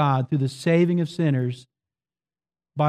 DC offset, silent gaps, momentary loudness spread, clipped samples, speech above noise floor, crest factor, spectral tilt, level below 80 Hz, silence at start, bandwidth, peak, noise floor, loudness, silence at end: under 0.1%; none; 13 LU; under 0.1%; over 68 dB; 14 dB; -8 dB/octave; -68 dBFS; 0 s; 11 kHz; -10 dBFS; under -90 dBFS; -23 LUFS; 0 s